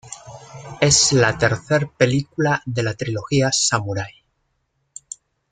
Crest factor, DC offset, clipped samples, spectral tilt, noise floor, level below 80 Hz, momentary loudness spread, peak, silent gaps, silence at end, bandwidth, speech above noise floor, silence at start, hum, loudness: 18 dB; under 0.1%; under 0.1%; -3.5 dB/octave; -70 dBFS; -50 dBFS; 23 LU; -2 dBFS; none; 1.4 s; 9.6 kHz; 51 dB; 0.05 s; none; -18 LUFS